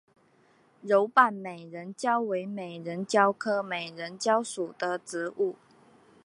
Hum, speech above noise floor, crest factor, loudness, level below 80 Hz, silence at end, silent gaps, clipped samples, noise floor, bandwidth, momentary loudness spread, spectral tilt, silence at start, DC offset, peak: none; 35 dB; 24 dB; -28 LUFS; -84 dBFS; 0.7 s; none; under 0.1%; -63 dBFS; 11.5 kHz; 15 LU; -4 dB/octave; 0.85 s; under 0.1%; -6 dBFS